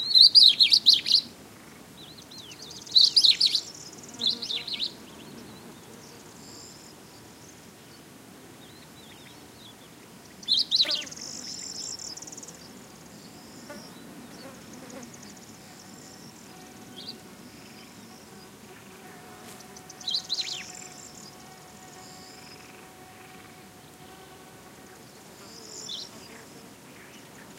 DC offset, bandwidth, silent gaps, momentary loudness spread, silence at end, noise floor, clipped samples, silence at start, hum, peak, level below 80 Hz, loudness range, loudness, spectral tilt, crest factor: under 0.1%; 16 kHz; none; 29 LU; 1 s; -49 dBFS; under 0.1%; 0 s; none; -2 dBFS; -68 dBFS; 24 LU; -20 LUFS; -0.5 dB/octave; 28 dB